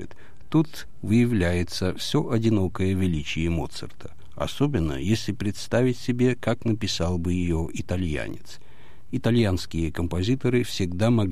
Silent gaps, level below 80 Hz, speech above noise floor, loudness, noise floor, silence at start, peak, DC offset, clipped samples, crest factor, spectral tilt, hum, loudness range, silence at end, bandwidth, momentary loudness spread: none; -42 dBFS; 20 dB; -25 LUFS; -44 dBFS; 0 s; -10 dBFS; 2%; under 0.1%; 16 dB; -6.5 dB/octave; none; 3 LU; 0 s; 15 kHz; 10 LU